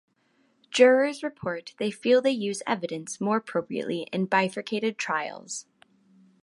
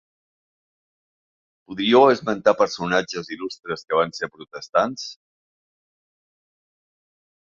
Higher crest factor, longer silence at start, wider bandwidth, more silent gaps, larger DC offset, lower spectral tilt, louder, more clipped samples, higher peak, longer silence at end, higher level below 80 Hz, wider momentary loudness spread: about the same, 22 dB vs 22 dB; second, 0.7 s vs 1.7 s; first, 11.5 kHz vs 7.6 kHz; second, none vs 4.69-4.73 s; neither; about the same, -4.5 dB/octave vs -4.5 dB/octave; second, -26 LUFS vs -21 LUFS; neither; about the same, -4 dBFS vs -2 dBFS; second, 0.8 s vs 2.45 s; second, -72 dBFS vs -64 dBFS; second, 14 LU vs 17 LU